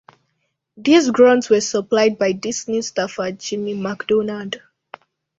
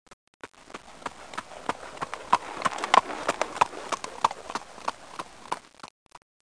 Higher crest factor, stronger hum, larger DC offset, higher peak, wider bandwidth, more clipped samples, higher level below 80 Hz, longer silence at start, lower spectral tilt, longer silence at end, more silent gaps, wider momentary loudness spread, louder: second, 18 dB vs 30 dB; neither; second, under 0.1% vs 0.2%; about the same, -2 dBFS vs 0 dBFS; second, 8 kHz vs 10.5 kHz; neither; about the same, -62 dBFS vs -64 dBFS; first, 0.75 s vs 0.1 s; first, -4 dB/octave vs -2 dB/octave; first, 0.8 s vs 0.25 s; second, none vs 0.13-0.40 s, 5.91-6.06 s; second, 12 LU vs 23 LU; first, -18 LUFS vs -29 LUFS